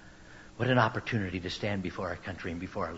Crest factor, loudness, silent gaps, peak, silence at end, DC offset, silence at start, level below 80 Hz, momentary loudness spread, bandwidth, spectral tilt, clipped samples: 22 dB; -32 LUFS; none; -10 dBFS; 0 s; under 0.1%; 0 s; -56 dBFS; 18 LU; 8 kHz; -6.5 dB/octave; under 0.1%